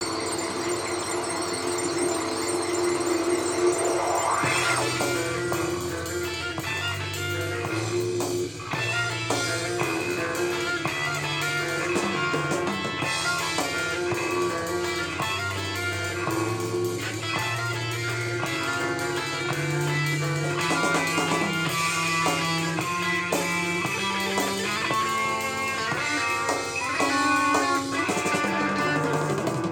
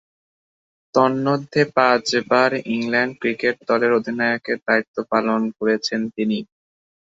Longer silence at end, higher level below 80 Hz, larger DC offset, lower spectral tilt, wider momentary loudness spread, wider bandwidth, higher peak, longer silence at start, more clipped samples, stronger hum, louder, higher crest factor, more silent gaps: second, 0 s vs 0.6 s; about the same, -60 dBFS vs -64 dBFS; neither; second, -3.5 dB/octave vs -5 dB/octave; about the same, 5 LU vs 6 LU; first, 19.5 kHz vs 8 kHz; second, -10 dBFS vs 0 dBFS; second, 0 s vs 0.95 s; neither; neither; second, -25 LUFS vs -20 LUFS; about the same, 16 dB vs 20 dB; second, none vs 4.88-4.94 s